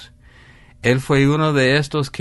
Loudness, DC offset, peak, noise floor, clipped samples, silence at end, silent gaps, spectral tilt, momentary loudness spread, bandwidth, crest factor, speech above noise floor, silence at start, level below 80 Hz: -17 LUFS; under 0.1%; -4 dBFS; -46 dBFS; under 0.1%; 0 s; none; -6 dB/octave; 6 LU; 11.5 kHz; 16 dB; 30 dB; 0 s; -44 dBFS